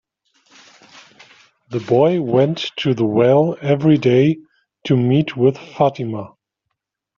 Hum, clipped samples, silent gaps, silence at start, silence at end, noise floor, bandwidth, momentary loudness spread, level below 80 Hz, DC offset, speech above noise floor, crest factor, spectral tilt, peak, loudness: none; under 0.1%; none; 1.7 s; 0.9 s; -78 dBFS; 7.2 kHz; 14 LU; -58 dBFS; under 0.1%; 62 dB; 16 dB; -6.5 dB/octave; -2 dBFS; -17 LUFS